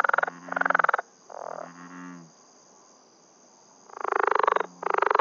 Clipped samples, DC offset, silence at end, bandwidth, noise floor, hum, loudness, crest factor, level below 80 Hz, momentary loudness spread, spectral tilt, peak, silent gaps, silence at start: under 0.1%; under 0.1%; 0 s; 7.4 kHz; -57 dBFS; none; -25 LUFS; 22 dB; under -90 dBFS; 21 LU; -1.5 dB/octave; -6 dBFS; none; 0 s